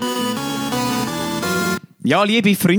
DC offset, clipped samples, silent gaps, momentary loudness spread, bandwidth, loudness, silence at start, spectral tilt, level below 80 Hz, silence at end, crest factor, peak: under 0.1%; under 0.1%; none; 7 LU; over 20 kHz; -19 LUFS; 0 s; -4.5 dB/octave; -54 dBFS; 0 s; 16 dB; -2 dBFS